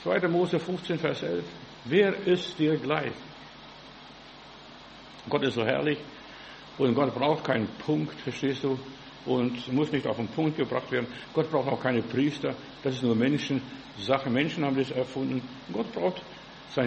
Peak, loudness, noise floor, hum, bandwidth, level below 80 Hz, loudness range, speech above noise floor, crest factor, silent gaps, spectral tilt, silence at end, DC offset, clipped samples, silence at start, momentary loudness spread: -8 dBFS; -28 LUFS; -48 dBFS; none; 8.4 kHz; -64 dBFS; 4 LU; 20 dB; 22 dB; none; -6.5 dB/octave; 0 s; under 0.1%; under 0.1%; 0 s; 19 LU